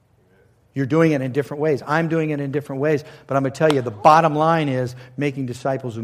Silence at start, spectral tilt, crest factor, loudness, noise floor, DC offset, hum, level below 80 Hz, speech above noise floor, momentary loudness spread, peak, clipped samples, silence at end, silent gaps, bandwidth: 0.75 s; -7 dB/octave; 18 dB; -20 LUFS; -57 dBFS; under 0.1%; none; -62 dBFS; 37 dB; 11 LU; -2 dBFS; under 0.1%; 0 s; none; 14.5 kHz